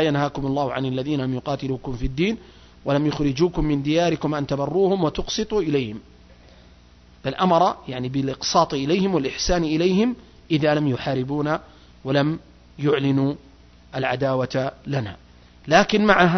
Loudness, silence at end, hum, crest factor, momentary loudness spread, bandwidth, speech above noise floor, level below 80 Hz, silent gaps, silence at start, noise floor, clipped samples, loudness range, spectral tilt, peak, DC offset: -22 LUFS; 0 s; none; 20 dB; 10 LU; 6.4 kHz; 29 dB; -40 dBFS; none; 0 s; -50 dBFS; under 0.1%; 3 LU; -5.5 dB/octave; -2 dBFS; under 0.1%